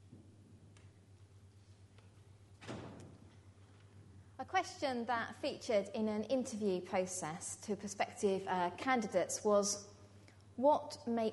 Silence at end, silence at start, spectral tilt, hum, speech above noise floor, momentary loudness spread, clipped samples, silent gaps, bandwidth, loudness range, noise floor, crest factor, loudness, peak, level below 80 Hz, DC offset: 0 s; 0.05 s; -4 dB/octave; none; 25 dB; 18 LU; under 0.1%; none; 11.5 kHz; 20 LU; -61 dBFS; 20 dB; -37 LUFS; -18 dBFS; -76 dBFS; under 0.1%